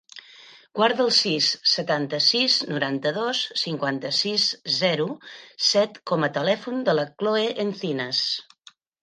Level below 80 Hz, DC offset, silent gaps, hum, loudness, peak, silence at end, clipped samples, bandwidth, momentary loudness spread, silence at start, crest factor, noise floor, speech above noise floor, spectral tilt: -76 dBFS; under 0.1%; none; none; -22 LUFS; -6 dBFS; 0.6 s; under 0.1%; 10 kHz; 8 LU; 0.15 s; 18 dB; -54 dBFS; 31 dB; -3.5 dB/octave